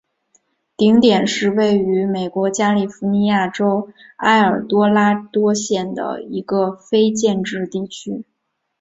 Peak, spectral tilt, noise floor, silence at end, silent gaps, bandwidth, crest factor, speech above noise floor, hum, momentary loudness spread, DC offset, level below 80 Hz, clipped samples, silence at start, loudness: -2 dBFS; -5 dB/octave; -73 dBFS; 0.6 s; none; 8 kHz; 16 dB; 57 dB; none; 11 LU; under 0.1%; -58 dBFS; under 0.1%; 0.8 s; -17 LUFS